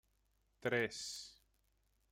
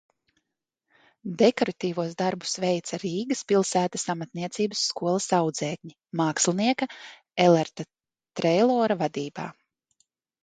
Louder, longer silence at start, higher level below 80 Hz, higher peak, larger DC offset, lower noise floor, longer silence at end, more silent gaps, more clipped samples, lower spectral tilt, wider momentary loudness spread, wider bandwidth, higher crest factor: second, -41 LUFS vs -25 LUFS; second, 0.6 s vs 1.25 s; about the same, -76 dBFS vs -72 dBFS; second, -24 dBFS vs -4 dBFS; neither; second, -79 dBFS vs -84 dBFS; about the same, 0.8 s vs 0.9 s; neither; neither; about the same, -3.5 dB/octave vs -4.5 dB/octave; about the same, 13 LU vs 15 LU; first, 16 kHz vs 9.6 kHz; about the same, 22 dB vs 22 dB